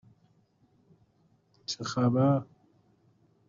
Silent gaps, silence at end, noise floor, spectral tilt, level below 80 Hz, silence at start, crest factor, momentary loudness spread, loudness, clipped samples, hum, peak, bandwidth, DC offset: none; 1.05 s; -68 dBFS; -7 dB/octave; -68 dBFS; 1.7 s; 18 dB; 18 LU; -28 LUFS; under 0.1%; none; -14 dBFS; 7.6 kHz; under 0.1%